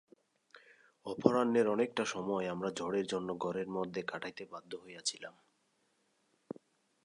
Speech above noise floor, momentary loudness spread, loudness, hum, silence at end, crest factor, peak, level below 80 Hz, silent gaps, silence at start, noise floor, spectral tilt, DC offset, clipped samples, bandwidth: 41 dB; 20 LU; -35 LUFS; none; 1.75 s; 28 dB; -10 dBFS; -76 dBFS; none; 1.05 s; -77 dBFS; -4.5 dB/octave; under 0.1%; under 0.1%; 11 kHz